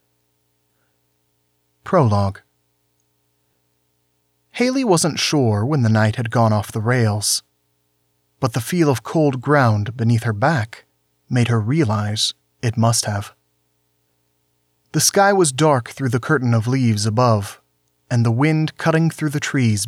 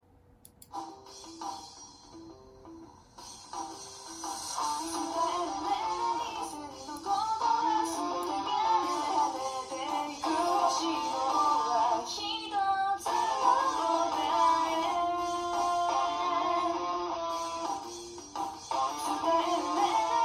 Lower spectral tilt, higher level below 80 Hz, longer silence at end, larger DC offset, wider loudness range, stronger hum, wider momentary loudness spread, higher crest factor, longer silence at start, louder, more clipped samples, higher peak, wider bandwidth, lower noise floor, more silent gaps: first, -5 dB/octave vs -2 dB/octave; first, -60 dBFS vs -66 dBFS; about the same, 0 s vs 0 s; neither; second, 6 LU vs 12 LU; first, 60 Hz at -45 dBFS vs none; second, 8 LU vs 16 LU; about the same, 16 dB vs 18 dB; first, 1.85 s vs 0.7 s; first, -18 LUFS vs -30 LUFS; neither; first, -4 dBFS vs -12 dBFS; about the same, 16 kHz vs 15 kHz; first, -67 dBFS vs -59 dBFS; neither